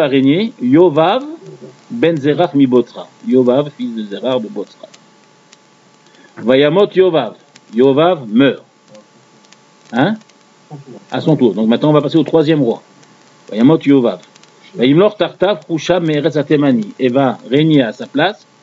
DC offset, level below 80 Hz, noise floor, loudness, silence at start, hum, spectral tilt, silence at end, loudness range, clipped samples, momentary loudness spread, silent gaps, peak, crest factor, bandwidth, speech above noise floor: under 0.1%; -60 dBFS; -48 dBFS; -13 LUFS; 0 s; none; -7.5 dB/octave; 0.3 s; 5 LU; under 0.1%; 15 LU; none; 0 dBFS; 14 dB; 7.8 kHz; 35 dB